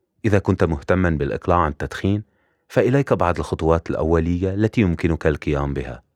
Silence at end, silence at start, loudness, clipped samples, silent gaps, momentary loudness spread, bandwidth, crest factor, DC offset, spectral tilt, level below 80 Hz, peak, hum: 0.15 s; 0.25 s; -21 LUFS; under 0.1%; none; 5 LU; 11.5 kHz; 18 dB; under 0.1%; -8 dB/octave; -34 dBFS; -2 dBFS; none